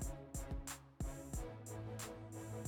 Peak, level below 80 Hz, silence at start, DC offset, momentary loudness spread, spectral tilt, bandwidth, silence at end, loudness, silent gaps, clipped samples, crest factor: -34 dBFS; -50 dBFS; 0 s; under 0.1%; 3 LU; -5 dB/octave; 19 kHz; 0 s; -48 LUFS; none; under 0.1%; 12 dB